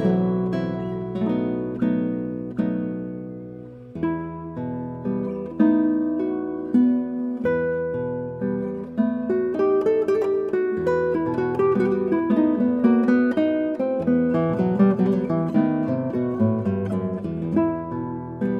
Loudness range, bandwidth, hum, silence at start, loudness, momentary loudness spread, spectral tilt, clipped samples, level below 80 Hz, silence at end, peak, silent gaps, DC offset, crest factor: 6 LU; 5.8 kHz; none; 0 s; -23 LUFS; 10 LU; -10 dB/octave; under 0.1%; -54 dBFS; 0 s; -6 dBFS; none; under 0.1%; 16 dB